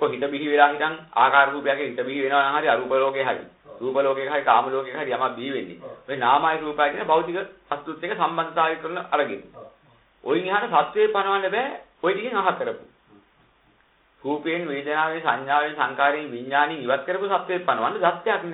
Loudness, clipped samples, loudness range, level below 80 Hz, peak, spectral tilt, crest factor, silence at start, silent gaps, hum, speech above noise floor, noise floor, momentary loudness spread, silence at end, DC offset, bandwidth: -23 LUFS; under 0.1%; 5 LU; -68 dBFS; 0 dBFS; -9 dB/octave; 22 dB; 0 s; none; none; 38 dB; -61 dBFS; 11 LU; 0 s; under 0.1%; 4.1 kHz